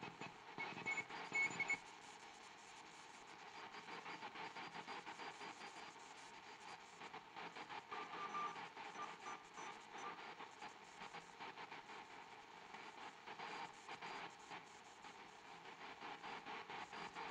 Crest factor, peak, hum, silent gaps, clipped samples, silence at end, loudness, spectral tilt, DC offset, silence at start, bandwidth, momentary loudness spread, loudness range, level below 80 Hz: 20 dB; -32 dBFS; none; none; under 0.1%; 0 s; -51 LUFS; -2.5 dB/octave; under 0.1%; 0 s; 11.5 kHz; 13 LU; 8 LU; -88 dBFS